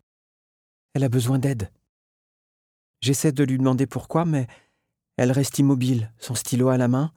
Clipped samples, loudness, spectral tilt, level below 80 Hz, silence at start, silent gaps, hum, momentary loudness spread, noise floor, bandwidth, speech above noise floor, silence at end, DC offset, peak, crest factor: under 0.1%; -23 LUFS; -6 dB/octave; -58 dBFS; 0.95 s; 1.89-2.94 s; none; 9 LU; -75 dBFS; 17.5 kHz; 54 dB; 0.05 s; under 0.1%; -8 dBFS; 16 dB